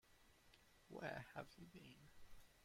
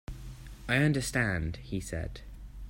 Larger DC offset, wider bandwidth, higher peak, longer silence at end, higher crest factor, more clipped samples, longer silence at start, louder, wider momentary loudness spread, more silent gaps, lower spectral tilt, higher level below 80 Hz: neither; about the same, 16.5 kHz vs 16 kHz; second, -34 dBFS vs -14 dBFS; about the same, 0 s vs 0 s; about the same, 24 dB vs 20 dB; neither; about the same, 0.05 s vs 0.1 s; second, -56 LUFS vs -31 LUFS; second, 15 LU vs 20 LU; neither; about the same, -5.5 dB/octave vs -5.5 dB/octave; second, -74 dBFS vs -44 dBFS